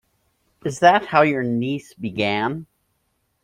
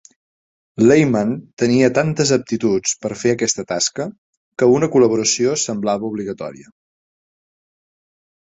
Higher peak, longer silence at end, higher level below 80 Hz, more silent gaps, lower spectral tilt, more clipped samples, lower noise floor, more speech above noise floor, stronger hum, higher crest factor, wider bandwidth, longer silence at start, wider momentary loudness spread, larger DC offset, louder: about the same, -2 dBFS vs -2 dBFS; second, 0.8 s vs 1.95 s; about the same, -60 dBFS vs -56 dBFS; second, none vs 1.53-1.57 s, 4.18-4.52 s; about the same, -5.5 dB/octave vs -4.5 dB/octave; neither; second, -70 dBFS vs under -90 dBFS; second, 50 dB vs over 73 dB; neither; about the same, 20 dB vs 18 dB; first, 13 kHz vs 8 kHz; second, 0.65 s vs 0.8 s; about the same, 14 LU vs 14 LU; neither; second, -20 LUFS vs -17 LUFS